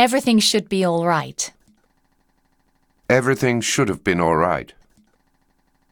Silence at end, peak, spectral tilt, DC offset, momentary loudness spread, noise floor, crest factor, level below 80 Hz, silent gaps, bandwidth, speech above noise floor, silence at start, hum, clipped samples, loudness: 1.25 s; -2 dBFS; -4 dB/octave; under 0.1%; 11 LU; -63 dBFS; 18 dB; -52 dBFS; none; 19.5 kHz; 45 dB; 0 s; none; under 0.1%; -19 LUFS